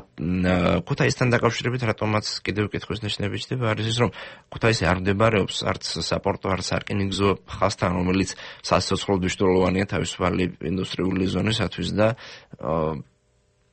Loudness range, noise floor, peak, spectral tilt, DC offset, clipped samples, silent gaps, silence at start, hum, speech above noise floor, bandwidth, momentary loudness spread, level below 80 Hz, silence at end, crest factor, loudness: 2 LU; -64 dBFS; -6 dBFS; -5.5 dB/octave; under 0.1%; under 0.1%; none; 0 s; none; 41 dB; 8.8 kHz; 7 LU; -46 dBFS; 0.7 s; 18 dB; -24 LUFS